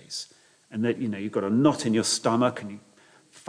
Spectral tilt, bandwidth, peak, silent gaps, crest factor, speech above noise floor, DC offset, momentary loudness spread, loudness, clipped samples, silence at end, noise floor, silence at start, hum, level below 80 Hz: -4.5 dB/octave; 10.5 kHz; -8 dBFS; none; 20 dB; 31 dB; under 0.1%; 17 LU; -25 LUFS; under 0.1%; 0.1 s; -55 dBFS; 0.1 s; none; -72 dBFS